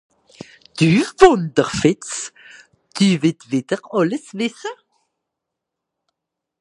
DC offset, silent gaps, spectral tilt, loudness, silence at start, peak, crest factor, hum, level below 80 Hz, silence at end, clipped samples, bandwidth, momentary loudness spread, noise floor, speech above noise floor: under 0.1%; none; -5.5 dB/octave; -18 LUFS; 0.75 s; 0 dBFS; 20 dB; none; -50 dBFS; 1.85 s; under 0.1%; 11.5 kHz; 19 LU; -82 dBFS; 65 dB